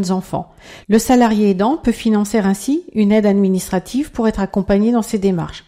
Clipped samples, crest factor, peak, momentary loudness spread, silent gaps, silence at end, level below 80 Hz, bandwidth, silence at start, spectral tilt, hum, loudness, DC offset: under 0.1%; 12 dB; -2 dBFS; 7 LU; none; 0.05 s; -40 dBFS; 16 kHz; 0 s; -6 dB/octave; none; -16 LUFS; under 0.1%